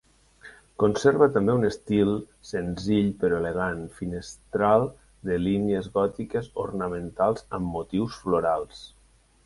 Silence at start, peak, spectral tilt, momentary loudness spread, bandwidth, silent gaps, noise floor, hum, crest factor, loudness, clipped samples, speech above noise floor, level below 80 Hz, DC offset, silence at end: 0.45 s; -6 dBFS; -7 dB/octave; 13 LU; 11.5 kHz; none; -51 dBFS; none; 20 dB; -26 LUFS; under 0.1%; 26 dB; -50 dBFS; under 0.1%; 0.6 s